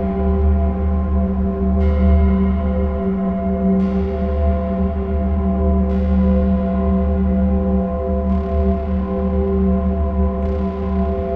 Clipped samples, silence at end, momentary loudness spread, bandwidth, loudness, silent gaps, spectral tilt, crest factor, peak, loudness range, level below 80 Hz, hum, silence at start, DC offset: under 0.1%; 0 s; 4 LU; 3.6 kHz; -18 LUFS; none; -12 dB/octave; 12 dB; -4 dBFS; 1 LU; -20 dBFS; none; 0 s; 0.8%